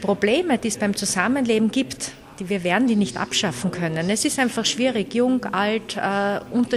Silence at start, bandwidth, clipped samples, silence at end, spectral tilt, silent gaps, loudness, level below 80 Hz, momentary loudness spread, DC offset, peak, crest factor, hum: 0 s; 13.5 kHz; under 0.1%; 0 s; -4 dB/octave; none; -22 LUFS; -54 dBFS; 5 LU; under 0.1%; -4 dBFS; 18 dB; none